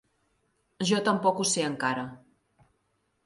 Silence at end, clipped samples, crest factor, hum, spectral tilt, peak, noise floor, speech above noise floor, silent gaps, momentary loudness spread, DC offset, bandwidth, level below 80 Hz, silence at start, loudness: 1.1 s; under 0.1%; 18 dB; none; -3.5 dB/octave; -12 dBFS; -74 dBFS; 47 dB; none; 9 LU; under 0.1%; 11.5 kHz; -70 dBFS; 0.8 s; -27 LUFS